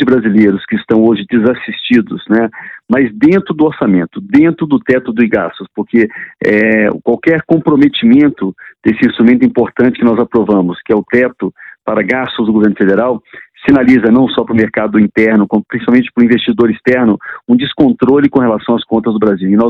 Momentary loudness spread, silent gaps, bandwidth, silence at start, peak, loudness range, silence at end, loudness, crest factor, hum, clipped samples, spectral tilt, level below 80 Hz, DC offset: 7 LU; none; 5.2 kHz; 0 s; 0 dBFS; 2 LU; 0 s; -11 LUFS; 10 dB; none; 0.3%; -8.5 dB/octave; -46 dBFS; under 0.1%